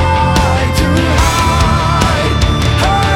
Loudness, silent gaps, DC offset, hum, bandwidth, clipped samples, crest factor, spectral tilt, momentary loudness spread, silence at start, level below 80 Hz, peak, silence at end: -12 LUFS; none; under 0.1%; none; 17 kHz; under 0.1%; 10 dB; -5 dB/octave; 1 LU; 0 s; -18 dBFS; 0 dBFS; 0 s